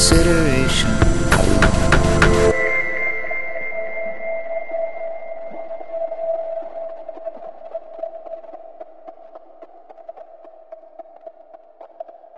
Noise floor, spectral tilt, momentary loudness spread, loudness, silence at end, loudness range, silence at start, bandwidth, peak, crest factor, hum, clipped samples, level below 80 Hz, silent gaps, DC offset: -45 dBFS; -4.5 dB/octave; 25 LU; -19 LUFS; 0 s; 23 LU; 0 s; 11.5 kHz; 0 dBFS; 20 dB; none; under 0.1%; -26 dBFS; none; 2%